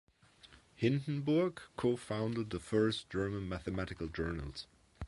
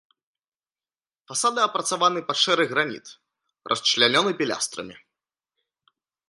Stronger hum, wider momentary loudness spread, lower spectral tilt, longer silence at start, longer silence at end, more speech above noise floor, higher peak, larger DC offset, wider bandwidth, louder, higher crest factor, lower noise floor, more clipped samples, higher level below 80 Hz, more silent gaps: neither; second, 8 LU vs 11 LU; first, -7 dB/octave vs -2 dB/octave; second, 0.45 s vs 1.3 s; second, 0 s vs 1.35 s; second, 26 dB vs over 67 dB; second, -18 dBFS vs -2 dBFS; neither; about the same, 11.5 kHz vs 11.5 kHz; second, -36 LUFS vs -22 LUFS; second, 18 dB vs 24 dB; second, -62 dBFS vs under -90 dBFS; neither; first, -54 dBFS vs -74 dBFS; neither